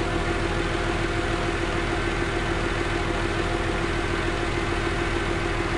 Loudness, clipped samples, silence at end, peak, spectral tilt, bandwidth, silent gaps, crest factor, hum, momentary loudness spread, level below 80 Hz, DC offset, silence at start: -26 LUFS; under 0.1%; 0 s; -12 dBFS; -5 dB/octave; 11.5 kHz; none; 12 dB; none; 0 LU; -32 dBFS; 0.4%; 0 s